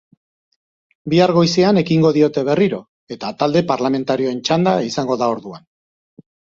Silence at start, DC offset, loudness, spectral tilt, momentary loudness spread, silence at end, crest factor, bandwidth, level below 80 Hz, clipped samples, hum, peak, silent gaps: 1.05 s; under 0.1%; -17 LUFS; -6 dB/octave; 14 LU; 1 s; 16 dB; 7.6 kHz; -56 dBFS; under 0.1%; none; -2 dBFS; 2.88-3.07 s